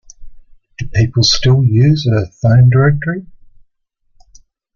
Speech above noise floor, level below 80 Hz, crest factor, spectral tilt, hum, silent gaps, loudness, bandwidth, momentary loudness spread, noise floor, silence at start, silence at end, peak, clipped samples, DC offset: 51 dB; -36 dBFS; 14 dB; -6 dB/octave; none; none; -12 LUFS; 7.2 kHz; 11 LU; -62 dBFS; 0.2 s; 1.5 s; 0 dBFS; under 0.1%; under 0.1%